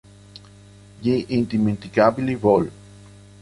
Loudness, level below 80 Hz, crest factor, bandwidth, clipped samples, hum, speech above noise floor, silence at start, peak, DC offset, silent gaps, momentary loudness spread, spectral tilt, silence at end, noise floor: -21 LUFS; -52 dBFS; 20 dB; 11.5 kHz; under 0.1%; 50 Hz at -40 dBFS; 27 dB; 1 s; -2 dBFS; under 0.1%; none; 5 LU; -8 dB/octave; 0.7 s; -46 dBFS